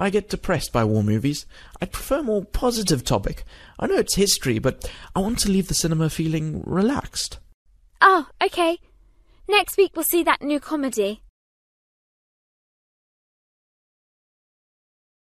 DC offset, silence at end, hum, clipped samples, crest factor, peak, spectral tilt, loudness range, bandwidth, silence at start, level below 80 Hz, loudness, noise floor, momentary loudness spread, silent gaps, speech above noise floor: under 0.1%; 4.15 s; none; under 0.1%; 22 dB; -2 dBFS; -4.5 dB/octave; 5 LU; 14 kHz; 0 s; -40 dBFS; -22 LUFS; -54 dBFS; 12 LU; 7.54-7.66 s; 32 dB